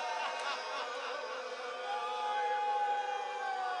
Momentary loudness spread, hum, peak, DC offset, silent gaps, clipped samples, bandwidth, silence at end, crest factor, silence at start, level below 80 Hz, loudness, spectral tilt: 7 LU; none; -24 dBFS; under 0.1%; none; under 0.1%; 11 kHz; 0 s; 14 dB; 0 s; under -90 dBFS; -36 LUFS; 0.5 dB/octave